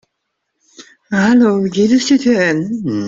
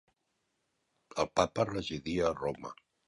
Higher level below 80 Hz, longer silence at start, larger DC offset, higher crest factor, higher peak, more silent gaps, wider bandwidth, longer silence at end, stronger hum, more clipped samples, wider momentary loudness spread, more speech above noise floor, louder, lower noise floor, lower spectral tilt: about the same, -54 dBFS vs -58 dBFS; second, 0.8 s vs 1.15 s; neither; second, 12 dB vs 24 dB; first, -2 dBFS vs -12 dBFS; neither; second, 7.8 kHz vs 11.5 kHz; second, 0 s vs 0.35 s; neither; neither; second, 8 LU vs 13 LU; first, 60 dB vs 48 dB; first, -13 LUFS vs -33 LUFS; second, -73 dBFS vs -81 dBFS; about the same, -5.5 dB/octave vs -5 dB/octave